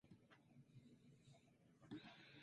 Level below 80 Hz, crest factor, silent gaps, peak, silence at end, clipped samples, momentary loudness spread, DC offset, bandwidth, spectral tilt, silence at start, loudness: -90 dBFS; 20 dB; none; -44 dBFS; 0 s; under 0.1%; 10 LU; under 0.1%; 10 kHz; -6 dB/octave; 0.05 s; -63 LUFS